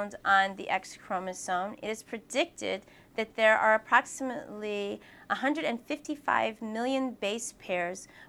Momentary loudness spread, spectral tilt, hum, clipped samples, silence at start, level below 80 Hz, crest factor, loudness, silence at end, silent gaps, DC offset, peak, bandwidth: 12 LU; -3 dB/octave; none; under 0.1%; 0 s; -70 dBFS; 22 dB; -30 LUFS; 0.05 s; none; under 0.1%; -8 dBFS; 16 kHz